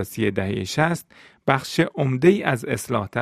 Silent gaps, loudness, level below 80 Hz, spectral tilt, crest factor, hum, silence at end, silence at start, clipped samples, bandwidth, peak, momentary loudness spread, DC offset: none; -22 LUFS; -56 dBFS; -6 dB/octave; 22 dB; none; 0 s; 0 s; under 0.1%; 15.5 kHz; 0 dBFS; 8 LU; under 0.1%